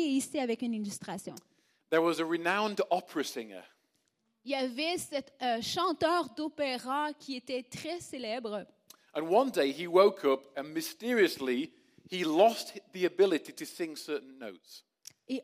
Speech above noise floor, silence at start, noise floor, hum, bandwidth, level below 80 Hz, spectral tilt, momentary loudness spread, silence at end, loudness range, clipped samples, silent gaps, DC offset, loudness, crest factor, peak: 46 dB; 0 s; -77 dBFS; none; 15.5 kHz; -80 dBFS; -4 dB/octave; 15 LU; 0 s; 5 LU; under 0.1%; none; under 0.1%; -32 LUFS; 22 dB; -10 dBFS